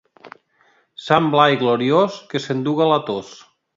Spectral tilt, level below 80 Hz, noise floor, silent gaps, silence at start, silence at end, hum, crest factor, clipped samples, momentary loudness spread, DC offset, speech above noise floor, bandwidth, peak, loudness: -6 dB/octave; -64 dBFS; -59 dBFS; none; 1 s; 0.45 s; none; 20 dB; under 0.1%; 12 LU; under 0.1%; 42 dB; 7.8 kHz; 0 dBFS; -18 LUFS